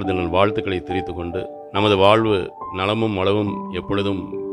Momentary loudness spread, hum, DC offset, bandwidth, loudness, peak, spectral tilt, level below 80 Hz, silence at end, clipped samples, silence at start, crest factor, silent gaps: 12 LU; none; under 0.1%; 11 kHz; -20 LUFS; 0 dBFS; -7 dB/octave; -46 dBFS; 0 s; under 0.1%; 0 s; 20 dB; none